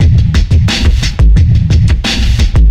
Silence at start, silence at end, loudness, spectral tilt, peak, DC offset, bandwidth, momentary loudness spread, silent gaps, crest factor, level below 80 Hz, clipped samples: 0 s; 0 s; -10 LUFS; -5.5 dB/octave; 0 dBFS; under 0.1%; 10.5 kHz; 3 LU; none; 8 dB; -10 dBFS; under 0.1%